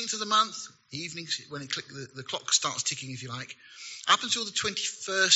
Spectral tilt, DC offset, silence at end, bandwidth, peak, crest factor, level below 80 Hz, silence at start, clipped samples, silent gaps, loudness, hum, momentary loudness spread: 0 dB/octave; under 0.1%; 0 s; 8 kHz; -6 dBFS; 26 dB; -74 dBFS; 0 s; under 0.1%; none; -28 LUFS; none; 16 LU